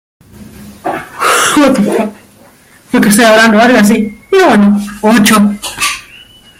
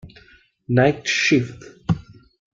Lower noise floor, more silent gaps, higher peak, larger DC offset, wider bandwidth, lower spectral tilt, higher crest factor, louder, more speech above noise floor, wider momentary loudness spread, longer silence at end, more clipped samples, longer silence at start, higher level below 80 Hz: second, -41 dBFS vs -53 dBFS; neither; first, 0 dBFS vs -4 dBFS; neither; first, 16.5 kHz vs 7.6 kHz; about the same, -4 dB/octave vs -5 dB/octave; second, 10 dB vs 18 dB; first, -8 LUFS vs -20 LUFS; about the same, 34 dB vs 34 dB; about the same, 14 LU vs 12 LU; about the same, 0.6 s vs 0.55 s; neither; first, 0.4 s vs 0.05 s; first, -44 dBFS vs -50 dBFS